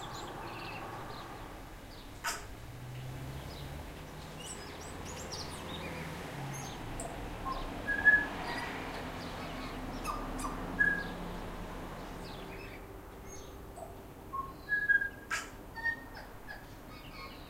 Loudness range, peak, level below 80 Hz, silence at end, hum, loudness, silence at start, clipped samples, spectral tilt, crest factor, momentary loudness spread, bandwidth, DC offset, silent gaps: 11 LU; -14 dBFS; -50 dBFS; 0 s; none; -37 LUFS; 0 s; under 0.1%; -3.5 dB/octave; 24 dB; 18 LU; 16 kHz; under 0.1%; none